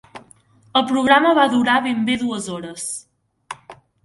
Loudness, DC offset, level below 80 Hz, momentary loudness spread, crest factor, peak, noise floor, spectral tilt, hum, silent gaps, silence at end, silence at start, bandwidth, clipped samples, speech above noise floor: -18 LUFS; under 0.1%; -60 dBFS; 22 LU; 20 dB; 0 dBFS; -52 dBFS; -3.5 dB/octave; none; none; 0.3 s; 0.15 s; 11.5 kHz; under 0.1%; 35 dB